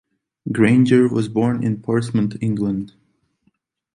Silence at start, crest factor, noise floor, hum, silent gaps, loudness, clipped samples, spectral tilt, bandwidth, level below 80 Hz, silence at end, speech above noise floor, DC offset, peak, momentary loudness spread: 0.45 s; 18 dB; -66 dBFS; none; none; -18 LUFS; under 0.1%; -8 dB/octave; 10.5 kHz; -54 dBFS; 1.05 s; 48 dB; under 0.1%; -2 dBFS; 13 LU